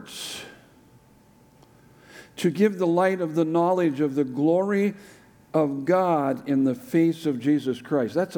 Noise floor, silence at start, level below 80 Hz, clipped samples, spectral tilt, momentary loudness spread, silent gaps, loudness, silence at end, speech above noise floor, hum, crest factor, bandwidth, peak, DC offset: -55 dBFS; 0 s; -70 dBFS; under 0.1%; -6.5 dB/octave; 11 LU; none; -24 LUFS; 0 s; 33 dB; none; 16 dB; 18.5 kHz; -8 dBFS; under 0.1%